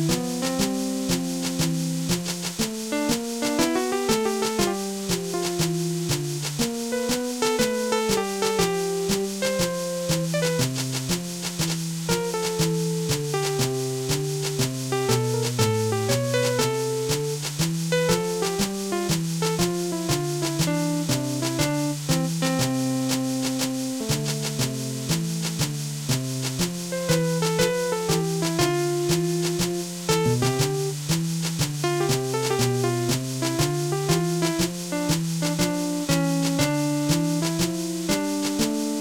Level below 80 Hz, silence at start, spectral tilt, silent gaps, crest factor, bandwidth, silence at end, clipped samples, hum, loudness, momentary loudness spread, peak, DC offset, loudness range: -50 dBFS; 0 s; -4.5 dB/octave; none; 18 dB; 18 kHz; 0 s; under 0.1%; none; -24 LUFS; 4 LU; -6 dBFS; under 0.1%; 2 LU